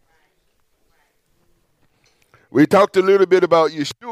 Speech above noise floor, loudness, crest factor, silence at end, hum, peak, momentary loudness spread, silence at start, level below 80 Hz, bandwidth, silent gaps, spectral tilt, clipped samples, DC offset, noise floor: 49 dB; -15 LUFS; 16 dB; 0 s; none; -2 dBFS; 8 LU; 2.55 s; -64 dBFS; 14 kHz; none; -6 dB/octave; under 0.1%; under 0.1%; -64 dBFS